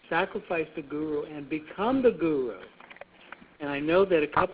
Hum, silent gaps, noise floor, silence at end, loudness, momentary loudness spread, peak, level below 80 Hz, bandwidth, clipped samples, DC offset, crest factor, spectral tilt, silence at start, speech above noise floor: none; none; -50 dBFS; 0 s; -28 LUFS; 24 LU; -10 dBFS; -58 dBFS; 4 kHz; under 0.1%; under 0.1%; 18 dB; -10 dB/octave; 0.1 s; 23 dB